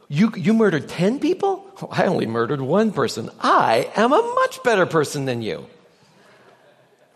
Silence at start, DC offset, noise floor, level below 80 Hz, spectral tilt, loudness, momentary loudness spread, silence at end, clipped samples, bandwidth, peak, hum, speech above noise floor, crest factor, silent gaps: 0.1 s; under 0.1%; -55 dBFS; -66 dBFS; -6 dB/octave; -20 LUFS; 8 LU; 1.5 s; under 0.1%; 13 kHz; -2 dBFS; none; 35 dB; 18 dB; none